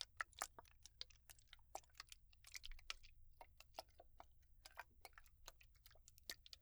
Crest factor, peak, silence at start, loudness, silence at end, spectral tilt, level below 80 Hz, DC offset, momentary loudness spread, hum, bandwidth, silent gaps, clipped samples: 34 dB; -26 dBFS; 0 s; -58 LUFS; 0 s; -0.5 dB/octave; -68 dBFS; under 0.1%; 15 LU; none; over 20 kHz; none; under 0.1%